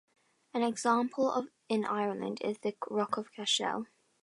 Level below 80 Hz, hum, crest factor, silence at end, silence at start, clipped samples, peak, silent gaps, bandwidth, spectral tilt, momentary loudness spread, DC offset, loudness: -84 dBFS; none; 20 dB; 0.4 s; 0.55 s; under 0.1%; -14 dBFS; none; 11.5 kHz; -3.5 dB/octave; 7 LU; under 0.1%; -33 LUFS